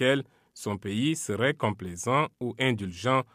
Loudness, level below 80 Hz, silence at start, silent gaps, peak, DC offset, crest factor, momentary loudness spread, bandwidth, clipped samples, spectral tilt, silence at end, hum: -29 LUFS; -64 dBFS; 0 s; none; -12 dBFS; under 0.1%; 18 dB; 8 LU; 15.5 kHz; under 0.1%; -5 dB/octave; 0.1 s; none